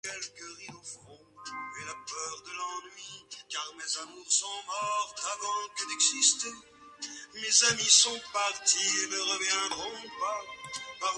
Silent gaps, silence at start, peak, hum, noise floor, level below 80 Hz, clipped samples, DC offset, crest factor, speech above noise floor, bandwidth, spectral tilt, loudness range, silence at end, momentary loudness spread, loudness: none; 0.05 s; -8 dBFS; none; -53 dBFS; -74 dBFS; under 0.1%; under 0.1%; 24 dB; 24 dB; 11.5 kHz; 1.5 dB/octave; 14 LU; 0 s; 21 LU; -28 LUFS